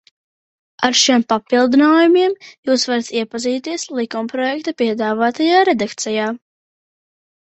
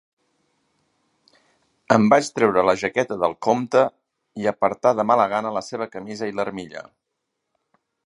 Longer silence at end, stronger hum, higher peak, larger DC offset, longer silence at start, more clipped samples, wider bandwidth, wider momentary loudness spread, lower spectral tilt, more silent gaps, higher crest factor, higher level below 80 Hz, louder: second, 1.05 s vs 1.25 s; neither; about the same, 0 dBFS vs 0 dBFS; neither; second, 0.8 s vs 1.9 s; neither; second, 8.2 kHz vs 11.5 kHz; about the same, 11 LU vs 13 LU; second, -2.5 dB/octave vs -5.5 dB/octave; first, 2.58-2.63 s vs none; second, 16 dB vs 22 dB; about the same, -64 dBFS vs -62 dBFS; first, -16 LUFS vs -21 LUFS